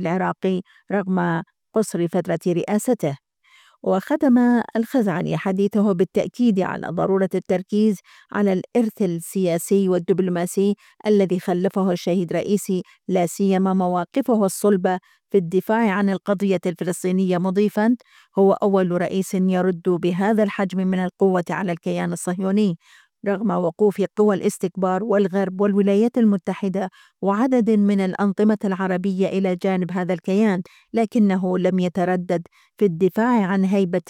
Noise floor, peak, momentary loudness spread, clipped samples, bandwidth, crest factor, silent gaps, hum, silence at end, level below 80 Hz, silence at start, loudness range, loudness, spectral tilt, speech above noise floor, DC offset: -55 dBFS; -6 dBFS; 6 LU; under 0.1%; 15.5 kHz; 14 dB; none; none; 0.1 s; -68 dBFS; 0 s; 2 LU; -21 LUFS; -7 dB/octave; 35 dB; under 0.1%